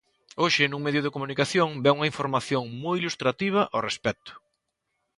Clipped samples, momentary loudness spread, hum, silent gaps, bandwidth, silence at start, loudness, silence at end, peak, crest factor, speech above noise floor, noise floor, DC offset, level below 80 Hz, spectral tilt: under 0.1%; 7 LU; none; none; 11.5 kHz; 0.35 s; -25 LUFS; 0.8 s; -8 dBFS; 20 dB; 53 dB; -79 dBFS; under 0.1%; -64 dBFS; -4.5 dB/octave